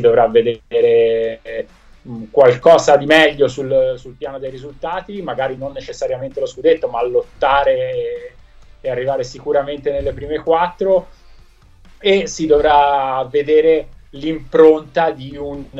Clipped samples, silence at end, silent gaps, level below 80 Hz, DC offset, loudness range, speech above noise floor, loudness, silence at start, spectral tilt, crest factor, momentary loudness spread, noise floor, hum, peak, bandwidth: under 0.1%; 0 s; none; -42 dBFS; under 0.1%; 7 LU; 29 dB; -15 LUFS; 0 s; -5 dB/octave; 16 dB; 17 LU; -45 dBFS; none; 0 dBFS; 8.4 kHz